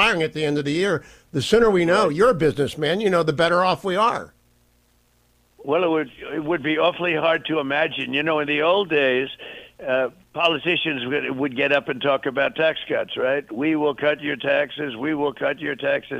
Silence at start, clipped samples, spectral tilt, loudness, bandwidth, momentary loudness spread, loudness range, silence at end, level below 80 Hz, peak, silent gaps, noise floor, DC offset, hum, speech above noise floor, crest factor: 0 s; under 0.1%; -5 dB/octave; -21 LUFS; 14 kHz; 8 LU; 4 LU; 0 s; -52 dBFS; -6 dBFS; none; -61 dBFS; under 0.1%; 60 Hz at -60 dBFS; 40 dB; 16 dB